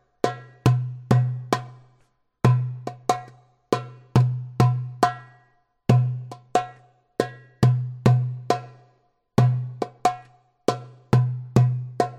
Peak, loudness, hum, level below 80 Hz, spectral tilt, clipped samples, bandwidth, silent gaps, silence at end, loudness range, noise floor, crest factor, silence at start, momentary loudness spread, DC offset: -4 dBFS; -24 LUFS; none; -52 dBFS; -7.5 dB/octave; under 0.1%; 11 kHz; none; 0 s; 2 LU; -64 dBFS; 20 dB; 0.25 s; 9 LU; under 0.1%